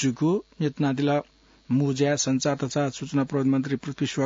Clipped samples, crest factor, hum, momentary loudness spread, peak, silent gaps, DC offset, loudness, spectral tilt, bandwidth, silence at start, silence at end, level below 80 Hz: under 0.1%; 14 dB; none; 5 LU; -10 dBFS; none; under 0.1%; -25 LUFS; -5.5 dB/octave; 7.8 kHz; 0 s; 0 s; -62 dBFS